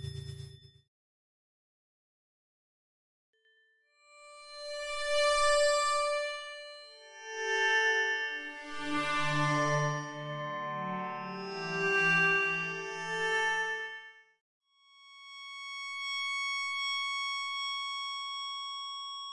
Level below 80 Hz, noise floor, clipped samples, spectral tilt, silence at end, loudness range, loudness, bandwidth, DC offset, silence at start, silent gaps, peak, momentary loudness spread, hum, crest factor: -62 dBFS; -70 dBFS; under 0.1%; -3 dB/octave; 0 s; 6 LU; -31 LUFS; 11.5 kHz; under 0.1%; 0 s; 0.88-3.33 s, 14.41-14.61 s; -18 dBFS; 18 LU; none; 18 dB